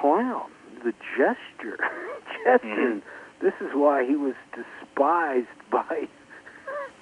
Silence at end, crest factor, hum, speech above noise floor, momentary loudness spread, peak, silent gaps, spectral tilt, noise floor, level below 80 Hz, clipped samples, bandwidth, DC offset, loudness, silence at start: 0.1 s; 20 dB; none; 21 dB; 17 LU; -6 dBFS; none; -6 dB/octave; -46 dBFS; -74 dBFS; under 0.1%; 11 kHz; under 0.1%; -26 LUFS; 0 s